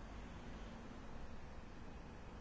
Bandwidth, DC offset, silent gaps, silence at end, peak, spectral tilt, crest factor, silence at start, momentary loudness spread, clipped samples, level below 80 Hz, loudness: 8 kHz; under 0.1%; none; 0 s; -40 dBFS; -6 dB/octave; 12 dB; 0 s; 2 LU; under 0.1%; -56 dBFS; -55 LUFS